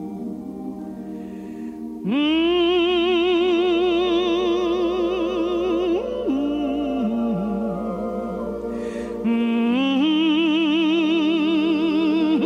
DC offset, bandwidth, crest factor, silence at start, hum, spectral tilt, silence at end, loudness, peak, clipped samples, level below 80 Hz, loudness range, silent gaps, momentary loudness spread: under 0.1%; 7.2 kHz; 10 dB; 0 s; none; -6 dB/octave; 0 s; -21 LUFS; -10 dBFS; under 0.1%; -50 dBFS; 5 LU; none; 14 LU